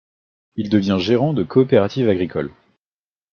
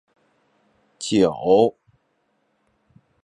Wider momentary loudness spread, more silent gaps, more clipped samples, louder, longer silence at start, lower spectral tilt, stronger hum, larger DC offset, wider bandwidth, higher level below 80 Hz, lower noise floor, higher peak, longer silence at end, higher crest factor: first, 13 LU vs 7 LU; neither; neither; about the same, -18 LUFS vs -19 LUFS; second, 0.55 s vs 1 s; first, -8 dB/octave vs -5.5 dB/octave; neither; neither; second, 6.8 kHz vs 11 kHz; about the same, -56 dBFS vs -60 dBFS; first, under -90 dBFS vs -69 dBFS; about the same, -2 dBFS vs -4 dBFS; second, 0.85 s vs 1.55 s; about the same, 18 dB vs 20 dB